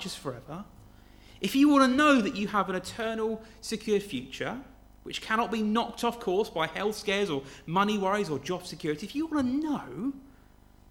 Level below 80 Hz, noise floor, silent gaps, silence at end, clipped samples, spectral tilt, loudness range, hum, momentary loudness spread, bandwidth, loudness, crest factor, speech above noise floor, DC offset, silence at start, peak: -56 dBFS; -56 dBFS; none; 0.65 s; under 0.1%; -5 dB/octave; 5 LU; 50 Hz at -55 dBFS; 15 LU; 17 kHz; -29 LUFS; 20 dB; 28 dB; under 0.1%; 0 s; -10 dBFS